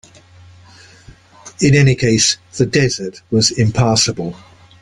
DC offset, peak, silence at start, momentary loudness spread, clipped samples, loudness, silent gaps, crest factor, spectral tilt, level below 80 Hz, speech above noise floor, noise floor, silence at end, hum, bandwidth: under 0.1%; 0 dBFS; 1.45 s; 8 LU; under 0.1%; -14 LUFS; none; 16 dB; -4.5 dB/octave; -42 dBFS; 29 dB; -43 dBFS; 0.45 s; none; 11 kHz